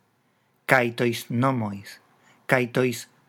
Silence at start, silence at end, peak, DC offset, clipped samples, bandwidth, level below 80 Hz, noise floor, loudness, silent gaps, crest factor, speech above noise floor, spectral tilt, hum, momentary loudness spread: 0.7 s; 0.25 s; -2 dBFS; under 0.1%; under 0.1%; 19.5 kHz; -72 dBFS; -67 dBFS; -24 LUFS; none; 24 dB; 43 dB; -5.5 dB/octave; none; 17 LU